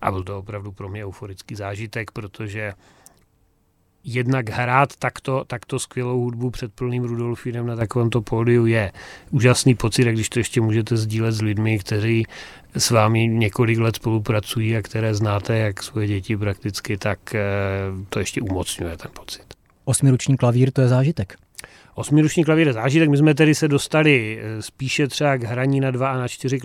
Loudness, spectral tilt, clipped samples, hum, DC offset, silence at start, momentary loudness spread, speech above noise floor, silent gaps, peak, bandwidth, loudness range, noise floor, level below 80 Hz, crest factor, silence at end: -21 LUFS; -5.5 dB/octave; under 0.1%; none; under 0.1%; 0 s; 15 LU; 42 dB; none; -2 dBFS; 15 kHz; 8 LU; -62 dBFS; -48 dBFS; 20 dB; 0 s